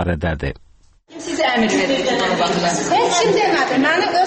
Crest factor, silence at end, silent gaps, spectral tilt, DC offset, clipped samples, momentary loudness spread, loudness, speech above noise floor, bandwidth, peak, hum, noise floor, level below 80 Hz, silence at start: 14 dB; 0 s; none; -4 dB/octave; under 0.1%; under 0.1%; 9 LU; -17 LUFS; 31 dB; 8.8 kHz; -4 dBFS; none; -48 dBFS; -38 dBFS; 0 s